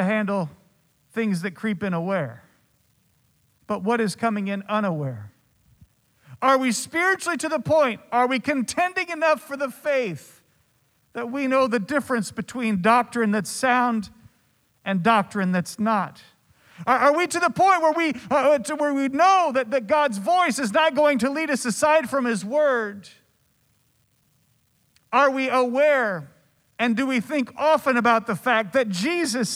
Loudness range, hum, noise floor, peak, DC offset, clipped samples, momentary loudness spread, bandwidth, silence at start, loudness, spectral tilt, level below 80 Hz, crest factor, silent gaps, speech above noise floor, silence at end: 7 LU; none; -65 dBFS; -6 dBFS; under 0.1%; under 0.1%; 9 LU; 16 kHz; 0 s; -22 LUFS; -4.5 dB/octave; -66 dBFS; 18 dB; none; 44 dB; 0 s